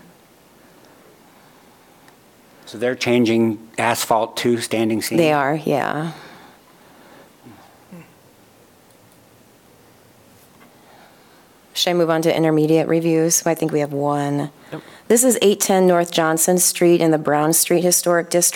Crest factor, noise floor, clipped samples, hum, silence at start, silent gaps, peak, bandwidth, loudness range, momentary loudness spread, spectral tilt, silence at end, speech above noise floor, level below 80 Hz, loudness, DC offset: 18 dB; -50 dBFS; under 0.1%; none; 2.65 s; none; -2 dBFS; 18 kHz; 11 LU; 10 LU; -4 dB/octave; 0 s; 33 dB; -68 dBFS; -17 LUFS; under 0.1%